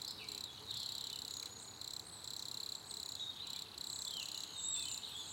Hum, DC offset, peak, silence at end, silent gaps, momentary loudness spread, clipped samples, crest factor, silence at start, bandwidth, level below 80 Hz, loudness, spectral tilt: none; under 0.1%; -28 dBFS; 0 s; none; 6 LU; under 0.1%; 18 dB; 0 s; 17 kHz; -76 dBFS; -43 LUFS; 0 dB/octave